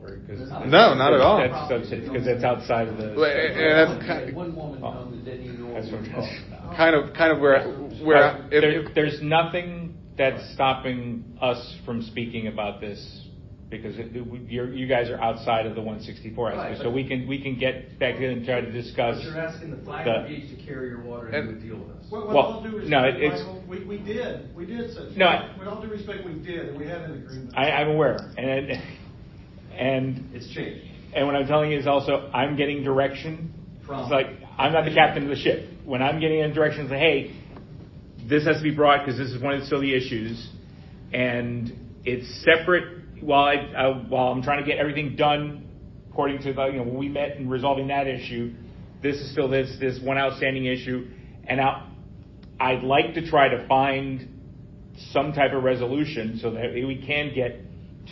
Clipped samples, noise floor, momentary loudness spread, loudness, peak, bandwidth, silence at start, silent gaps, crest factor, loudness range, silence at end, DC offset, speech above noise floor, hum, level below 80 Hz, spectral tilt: under 0.1%; -44 dBFS; 17 LU; -24 LUFS; 0 dBFS; 6 kHz; 0 s; none; 24 dB; 7 LU; 0 s; under 0.1%; 20 dB; none; -48 dBFS; -7 dB/octave